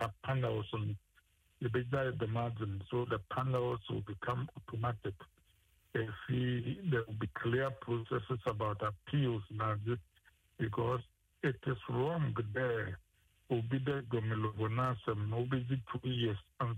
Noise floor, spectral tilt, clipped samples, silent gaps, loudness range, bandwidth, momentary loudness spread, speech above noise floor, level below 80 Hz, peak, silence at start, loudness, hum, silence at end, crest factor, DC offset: -71 dBFS; -8.5 dB/octave; under 0.1%; none; 2 LU; 9.4 kHz; 6 LU; 35 dB; -62 dBFS; -22 dBFS; 0 s; -37 LUFS; none; 0 s; 16 dB; under 0.1%